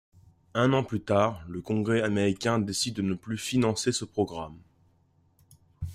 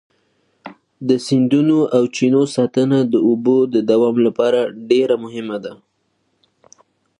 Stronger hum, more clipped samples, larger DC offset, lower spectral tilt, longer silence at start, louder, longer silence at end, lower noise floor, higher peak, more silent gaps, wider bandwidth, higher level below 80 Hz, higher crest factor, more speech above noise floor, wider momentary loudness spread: neither; neither; neither; second, -5 dB/octave vs -6.5 dB/octave; about the same, 0.55 s vs 0.65 s; second, -28 LUFS vs -16 LUFS; second, 0 s vs 1.45 s; about the same, -66 dBFS vs -67 dBFS; second, -10 dBFS vs -2 dBFS; neither; first, 15.5 kHz vs 11 kHz; first, -58 dBFS vs -68 dBFS; about the same, 18 dB vs 16 dB; second, 38 dB vs 51 dB; about the same, 9 LU vs 11 LU